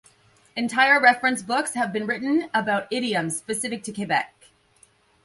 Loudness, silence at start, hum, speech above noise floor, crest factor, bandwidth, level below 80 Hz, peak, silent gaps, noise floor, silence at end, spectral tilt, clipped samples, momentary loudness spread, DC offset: -22 LUFS; 0.55 s; none; 36 dB; 20 dB; 12 kHz; -68 dBFS; -4 dBFS; none; -59 dBFS; 1 s; -3 dB/octave; under 0.1%; 13 LU; under 0.1%